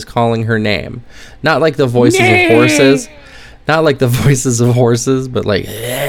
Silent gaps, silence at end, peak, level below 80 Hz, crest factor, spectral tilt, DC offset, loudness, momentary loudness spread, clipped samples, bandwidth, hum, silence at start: none; 0 s; 0 dBFS; -38 dBFS; 12 dB; -5 dB/octave; under 0.1%; -12 LUFS; 11 LU; 0.3%; 18 kHz; none; 0 s